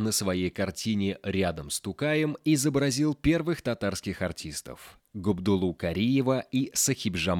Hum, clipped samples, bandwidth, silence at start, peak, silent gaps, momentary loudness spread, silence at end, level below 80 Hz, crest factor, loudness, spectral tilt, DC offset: none; under 0.1%; 18.5 kHz; 0 s; -12 dBFS; none; 8 LU; 0 s; -52 dBFS; 16 dB; -28 LUFS; -4.5 dB/octave; under 0.1%